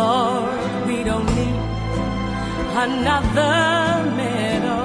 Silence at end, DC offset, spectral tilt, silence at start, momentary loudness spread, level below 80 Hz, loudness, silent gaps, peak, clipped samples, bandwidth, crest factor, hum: 0 s; under 0.1%; -5.5 dB/octave; 0 s; 7 LU; -32 dBFS; -20 LUFS; none; -6 dBFS; under 0.1%; 10.5 kHz; 14 dB; none